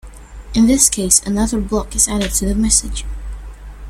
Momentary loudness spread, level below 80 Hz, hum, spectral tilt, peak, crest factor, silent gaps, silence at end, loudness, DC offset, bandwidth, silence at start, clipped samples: 19 LU; -28 dBFS; none; -3 dB/octave; 0 dBFS; 18 dB; none; 0 s; -14 LUFS; under 0.1%; 16.5 kHz; 0.05 s; under 0.1%